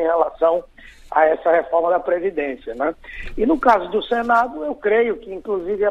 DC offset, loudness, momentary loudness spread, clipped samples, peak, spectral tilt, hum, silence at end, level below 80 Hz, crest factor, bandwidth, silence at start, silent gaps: under 0.1%; -19 LUFS; 9 LU; under 0.1%; -2 dBFS; -6 dB/octave; none; 0 s; -42 dBFS; 18 dB; 8 kHz; 0 s; none